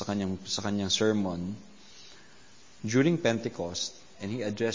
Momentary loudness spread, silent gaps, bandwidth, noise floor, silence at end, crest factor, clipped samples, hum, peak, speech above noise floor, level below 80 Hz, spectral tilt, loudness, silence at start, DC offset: 20 LU; none; 7.6 kHz; -56 dBFS; 0 s; 18 dB; under 0.1%; none; -12 dBFS; 27 dB; -58 dBFS; -4.5 dB/octave; -30 LUFS; 0 s; 0.2%